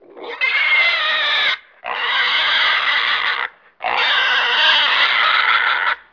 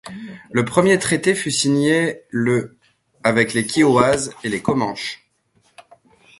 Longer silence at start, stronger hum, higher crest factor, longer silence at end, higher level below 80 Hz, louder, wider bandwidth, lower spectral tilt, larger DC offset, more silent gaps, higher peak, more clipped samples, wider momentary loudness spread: about the same, 0.15 s vs 0.05 s; neither; second, 14 dB vs 20 dB; second, 0.15 s vs 1.25 s; second, -60 dBFS vs -54 dBFS; first, -15 LUFS vs -18 LUFS; second, 5.4 kHz vs 11.5 kHz; second, 0.5 dB/octave vs -4.5 dB/octave; neither; neither; about the same, -2 dBFS vs 0 dBFS; neither; second, 10 LU vs 13 LU